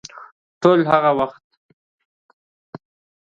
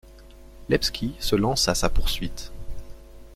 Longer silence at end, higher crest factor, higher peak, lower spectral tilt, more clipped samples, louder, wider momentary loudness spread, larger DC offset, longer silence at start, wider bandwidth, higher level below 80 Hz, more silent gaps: first, 1.9 s vs 0 s; about the same, 22 dB vs 18 dB; first, 0 dBFS vs -6 dBFS; first, -7 dB/octave vs -4 dB/octave; neither; first, -17 LUFS vs -25 LUFS; second, 11 LU vs 21 LU; neither; about the same, 0.15 s vs 0.05 s; second, 7.4 kHz vs 15.5 kHz; second, -62 dBFS vs -32 dBFS; first, 0.32-0.61 s vs none